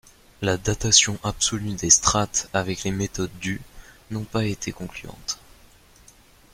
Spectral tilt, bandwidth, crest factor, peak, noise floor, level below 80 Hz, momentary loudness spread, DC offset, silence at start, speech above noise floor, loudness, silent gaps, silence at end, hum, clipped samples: -2.5 dB/octave; 16 kHz; 26 dB; 0 dBFS; -53 dBFS; -44 dBFS; 17 LU; under 0.1%; 0.4 s; 29 dB; -22 LUFS; none; 1.2 s; none; under 0.1%